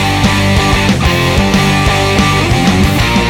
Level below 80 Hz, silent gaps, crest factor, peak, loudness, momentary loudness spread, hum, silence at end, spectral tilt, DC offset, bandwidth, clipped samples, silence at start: -20 dBFS; none; 10 dB; 0 dBFS; -10 LUFS; 1 LU; none; 0 s; -5 dB/octave; under 0.1%; 19 kHz; under 0.1%; 0 s